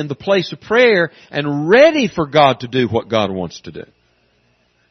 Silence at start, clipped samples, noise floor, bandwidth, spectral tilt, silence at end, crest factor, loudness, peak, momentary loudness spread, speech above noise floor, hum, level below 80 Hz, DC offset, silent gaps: 0 s; under 0.1%; -59 dBFS; 6.4 kHz; -5.5 dB/octave; 1.1 s; 16 dB; -15 LUFS; 0 dBFS; 16 LU; 44 dB; none; -54 dBFS; under 0.1%; none